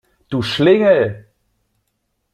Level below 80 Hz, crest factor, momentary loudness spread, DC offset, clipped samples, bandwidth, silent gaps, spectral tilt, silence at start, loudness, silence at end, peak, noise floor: -54 dBFS; 16 dB; 13 LU; under 0.1%; under 0.1%; 12.5 kHz; none; -6.5 dB/octave; 0.3 s; -15 LUFS; 1.15 s; -2 dBFS; -70 dBFS